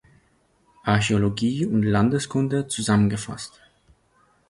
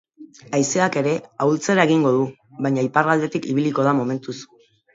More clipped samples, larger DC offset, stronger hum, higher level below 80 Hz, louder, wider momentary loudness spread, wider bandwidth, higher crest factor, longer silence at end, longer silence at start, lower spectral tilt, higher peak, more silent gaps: neither; neither; neither; first, -50 dBFS vs -68 dBFS; about the same, -22 LUFS vs -20 LUFS; about the same, 11 LU vs 10 LU; first, 11.5 kHz vs 8 kHz; about the same, 18 dB vs 20 dB; first, 1 s vs 0.5 s; first, 0.85 s vs 0.2 s; about the same, -5.5 dB/octave vs -5.5 dB/octave; second, -6 dBFS vs 0 dBFS; neither